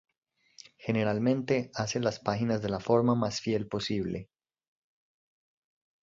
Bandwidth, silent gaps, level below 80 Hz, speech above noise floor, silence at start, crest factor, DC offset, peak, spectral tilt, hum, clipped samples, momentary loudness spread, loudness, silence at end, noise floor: 7.8 kHz; none; -60 dBFS; 27 dB; 0.8 s; 20 dB; under 0.1%; -12 dBFS; -6 dB/octave; none; under 0.1%; 7 LU; -30 LUFS; 1.8 s; -56 dBFS